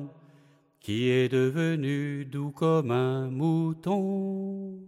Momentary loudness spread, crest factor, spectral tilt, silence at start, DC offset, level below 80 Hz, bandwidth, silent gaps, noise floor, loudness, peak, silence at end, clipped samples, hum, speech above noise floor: 9 LU; 14 dB; -7.5 dB/octave; 0 s; under 0.1%; -70 dBFS; 13 kHz; none; -60 dBFS; -28 LUFS; -14 dBFS; 0 s; under 0.1%; none; 33 dB